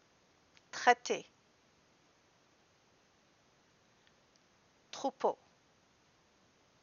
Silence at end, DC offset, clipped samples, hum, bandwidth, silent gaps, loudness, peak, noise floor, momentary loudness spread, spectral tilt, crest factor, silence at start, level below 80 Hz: 1.5 s; under 0.1%; under 0.1%; none; 7.2 kHz; none; -35 LUFS; -10 dBFS; -70 dBFS; 20 LU; 0 dB/octave; 30 dB; 0.75 s; -88 dBFS